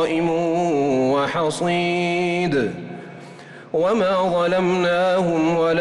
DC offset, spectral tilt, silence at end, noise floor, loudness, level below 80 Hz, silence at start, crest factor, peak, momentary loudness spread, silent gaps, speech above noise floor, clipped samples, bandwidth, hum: under 0.1%; -6 dB/octave; 0 s; -40 dBFS; -20 LUFS; -56 dBFS; 0 s; 10 dB; -10 dBFS; 16 LU; none; 21 dB; under 0.1%; 11.5 kHz; none